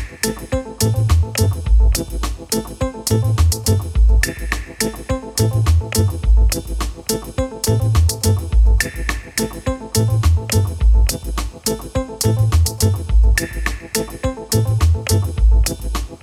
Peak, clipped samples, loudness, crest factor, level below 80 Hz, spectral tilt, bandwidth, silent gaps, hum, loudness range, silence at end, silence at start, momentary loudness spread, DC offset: -2 dBFS; under 0.1%; -18 LUFS; 14 dB; -18 dBFS; -5 dB/octave; 16 kHz; none; none; 1 LU; 0.05 s; 0 s; 9 LU; under 0.1%